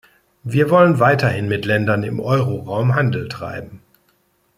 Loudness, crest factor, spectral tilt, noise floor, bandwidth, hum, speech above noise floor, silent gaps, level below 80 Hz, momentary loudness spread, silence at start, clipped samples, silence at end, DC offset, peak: -17 LUFS; 16 dB; -7.5 dB/octave; -62 dBFS; 15 kHz; none; 45 dB; none; -54 dBFS; 15 LU; 0.45 s; under 0.1%; 0.8 s; under 0.1%; -2 dBFS